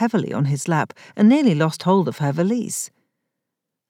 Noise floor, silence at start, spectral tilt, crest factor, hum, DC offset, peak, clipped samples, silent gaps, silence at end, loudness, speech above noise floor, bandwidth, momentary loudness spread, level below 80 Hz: -82 dBFS; 0 s; -6 dB/octave; 14 dB; none; under 0.1%; -6 dBFS; under 0.1%; none; 1.05 s; -20 LUFS; 63 dB; 16 kHz; 11 LU; -84 dBFS